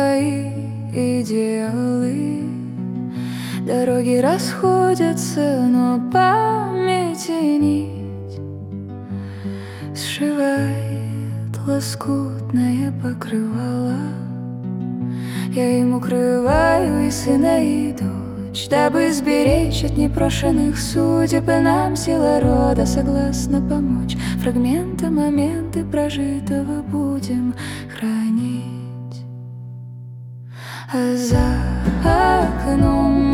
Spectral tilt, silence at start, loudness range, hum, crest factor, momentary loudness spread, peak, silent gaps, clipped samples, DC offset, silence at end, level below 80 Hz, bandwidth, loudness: -6 dB/octave; 0 s; 7 LU; none; 16 dB; 14 LU; -2 dBFS; none; under 0.1%; under 0.1%; 0 s; -32 dBFS; 16.5 kHz; -19 LUFS